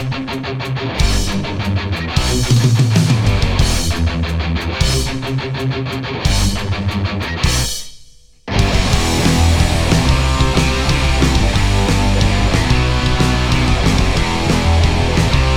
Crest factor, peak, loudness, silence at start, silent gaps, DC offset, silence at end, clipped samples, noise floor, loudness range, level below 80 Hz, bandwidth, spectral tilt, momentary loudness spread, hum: 14 dB; 0 dBFS; -16 LUFS; 0 s; none; under 0.1%; 0 s; under 0.1%; -42 dBFS; 4 LU; -20 dBFS; 18 kHz; -5 dB/octave; 7 LU; none